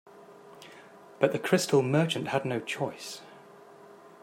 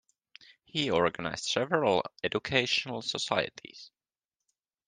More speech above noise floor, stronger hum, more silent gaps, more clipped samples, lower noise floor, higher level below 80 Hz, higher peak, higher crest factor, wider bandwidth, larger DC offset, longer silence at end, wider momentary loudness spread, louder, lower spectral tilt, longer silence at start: second, 24 dB vs over 60 dB; neither; neither; neither; second, -52 dBFS vs under -90 dBFS; second, -76 dBFS vs -66 dBFS; about the same, -6 dBFS vs -8 dBFS; about the same, 24 dB vs 24 dB; first, 16 kHz vs 10 kHz; neither; second, 0.15 s vs 1 s; first, 24 LU vs 10 LU; about the same, -28 LUFS vs -30 LUFS; first, -5 dB/octave vs -3.5 dB/octave; second, 0.15 s vs 0.75 s